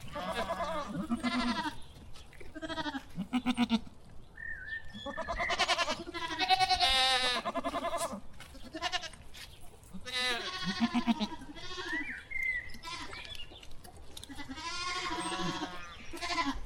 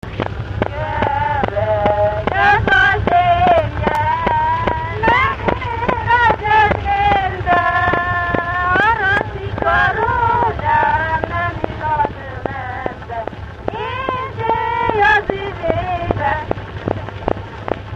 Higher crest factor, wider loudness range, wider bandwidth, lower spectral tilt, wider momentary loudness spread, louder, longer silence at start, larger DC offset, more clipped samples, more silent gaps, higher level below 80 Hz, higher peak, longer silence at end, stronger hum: first, 24 dB vs 16 dB; first, 9 LU vs 5 LU; first, 16 kHz vs 8.4 kHz; second, -3 dB/octave vs -7 dB/octave; first, 20 LU vs 11 LU; second, -33 LUFS vs -16 LUFS; about the same, 0 s vs 0.05 s; neither; neither; neither; second, -52 dBFS vs -32 dBFS; second, -12 dBFS vs 0 dBFS; about the same, 0 s vs 0 s; neither